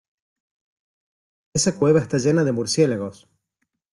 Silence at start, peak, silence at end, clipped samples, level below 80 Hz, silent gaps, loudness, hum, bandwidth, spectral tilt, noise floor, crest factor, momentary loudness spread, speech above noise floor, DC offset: 1.55 s; -6 dBFS; 0.8 s; under 0.1%; -58 dBFS; none; -20 LUFS; none; 12 kHz; -5 dB/octave; -77 dBFS; 18 dB; 9 LU; 57 dB; under 0.1%